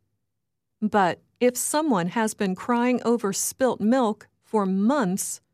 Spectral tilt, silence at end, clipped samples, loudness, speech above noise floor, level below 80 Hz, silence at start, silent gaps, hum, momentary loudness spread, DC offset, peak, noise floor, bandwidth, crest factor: -4.5 dB/octave; 0.15 s; under 0.1%; -24 LUFS; 59 dB; -70 dBFS; 0.8 s; none; none; 5 LU; under 0.1%; -10 dBFS; -83 dBFS; 15.5 kHz; 14 dB